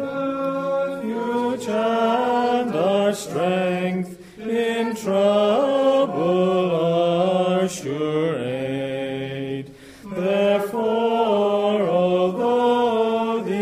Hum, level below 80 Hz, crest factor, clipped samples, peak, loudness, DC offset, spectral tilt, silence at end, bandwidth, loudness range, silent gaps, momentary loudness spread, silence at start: none; -62 dBFS; 14 dB; under 0.1%; -8 dBFS; -21 LUFS; under 0.1%; -6 dB/octave; 0 s; 15.5 kHz; 4 LU; none; 8 LU; 0 s